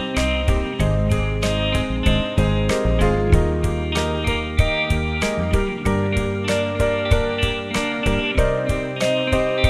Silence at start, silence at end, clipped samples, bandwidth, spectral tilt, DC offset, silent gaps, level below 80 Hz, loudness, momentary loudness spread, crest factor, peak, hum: 0 s; 0 s; under 0.1%; 14 kHz; -5.5 dB/octave; under 0.1%; none; -24 dBFS; -20 LUFS; 3 LU; 16 dB; -2 dBFS; none